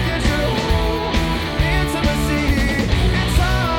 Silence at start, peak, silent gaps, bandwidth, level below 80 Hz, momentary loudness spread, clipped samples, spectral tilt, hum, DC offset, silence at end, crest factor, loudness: 0 s; -4 dBFS; none; 17.5 kHz; -22 dBFS; 2 LU; under 0.1%; -5.5 dB/octave; none; under 0.1%; 0 s; 14 dB; -18 LUFS